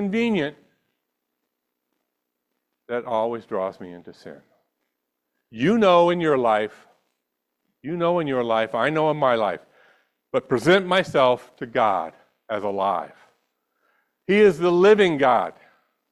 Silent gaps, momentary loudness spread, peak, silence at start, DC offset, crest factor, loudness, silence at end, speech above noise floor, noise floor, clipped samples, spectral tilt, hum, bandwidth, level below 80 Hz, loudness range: none; 15 LU; -4 dBFS; 0 s; under 0.1%; 18 dB; -21 LUFS; 0.6 s; 58 dB; -79 dBFS; under 0.1%; -6 dB/octave; none; 12 kHz; -64 dBFS; 11 LU